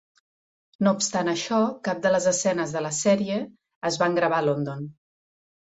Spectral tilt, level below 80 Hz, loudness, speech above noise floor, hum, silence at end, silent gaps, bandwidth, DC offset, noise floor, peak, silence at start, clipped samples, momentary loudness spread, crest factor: -4 dB/octave; -66 dBFS; -24 LUFS; over 66 dB; none; 0.85 s; 3.76-3.81 s; 8.2 kHz; under 0.1%; under -90 dBFS; -8 dBFS; 0.8 s; under 0.1%; 10 LU; 18 dB